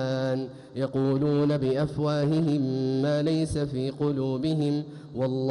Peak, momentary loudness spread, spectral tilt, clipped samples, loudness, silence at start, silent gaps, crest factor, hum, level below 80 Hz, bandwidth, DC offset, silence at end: -16 dBFS; 7 LU; -8 dB/octave; under 0.1%; -27 LUFS; 0 s; none; 10 dB; none; -54 dBFS; 11.5 kHz; under 0.1%; 0 s